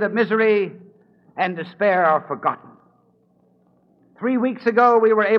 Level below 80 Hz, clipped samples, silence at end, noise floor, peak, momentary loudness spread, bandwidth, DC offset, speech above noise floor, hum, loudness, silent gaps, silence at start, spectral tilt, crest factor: -76 dBFS; under 0.1%; 0 s; -60 dBFS; -2 dBFS; 12 LU; 5.8 kHz; under 0.1%; 41 dB; none; -19 LUFS; none; 0 s; -8 dB/octave; 18 dB